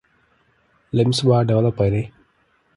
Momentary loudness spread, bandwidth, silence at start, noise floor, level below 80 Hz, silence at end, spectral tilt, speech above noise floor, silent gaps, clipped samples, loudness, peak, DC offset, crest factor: 9 LU; 11.5 kHz; 0.95 s; -62 dBFS; -46 dBFS; 0.7 s; -7 dB/octave; 45 dB; none; under 0.1%; -19 LUFS; -4 dBFS; under 0.1%; 18 dB